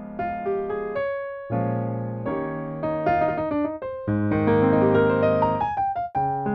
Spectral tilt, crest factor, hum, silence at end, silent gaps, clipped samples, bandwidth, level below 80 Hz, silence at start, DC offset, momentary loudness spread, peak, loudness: -10.5 dB/octave; 16 dB; none; 0 s; none; under 0.1%; 5.8 kHz; -50 dBFS; 0 s; under 0.1%; 10 LU; -8 dBFS; -24 LUFS